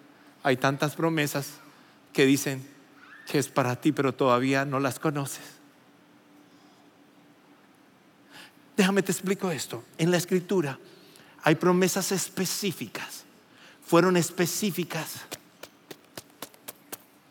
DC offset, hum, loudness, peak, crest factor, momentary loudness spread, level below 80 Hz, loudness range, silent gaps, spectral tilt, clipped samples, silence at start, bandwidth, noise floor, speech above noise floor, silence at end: under 0.1%; none; -26 LUFS; -8 dBFS; 20 dB; 21 LU; -84 dBFS; 6 LU; none; -4.5 dB/octave; under 0.1%; 0.45 s; 17 kHz; -58 dBFS; 32 dB; 0.35 s